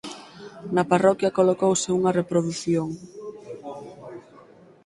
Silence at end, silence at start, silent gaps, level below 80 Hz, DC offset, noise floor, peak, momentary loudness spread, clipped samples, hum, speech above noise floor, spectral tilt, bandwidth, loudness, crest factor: 0.65 s; 0.05 s; none; -62 dBFS; under 0.1%; -50 dBFS; -4 dBFS; 21 LU; under 0.1%; none; 29 dB; -5.5 dB/octave; 11.5 kHz; -22 LUFS; 20 dB